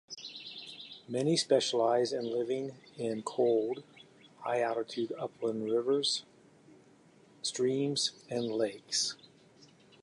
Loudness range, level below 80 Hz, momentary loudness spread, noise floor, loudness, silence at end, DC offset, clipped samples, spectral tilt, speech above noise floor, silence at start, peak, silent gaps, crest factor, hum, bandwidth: 3 LU; -82 dBFS; 14 LU; -61 dBFS; -32 LUFS; 0.35 s; under 0.1%; under 0.1%; -3.5 dB/octave; 29 dB; 0.1 s; -14 dBFS; none; 20 dB; none; 11.5 kHz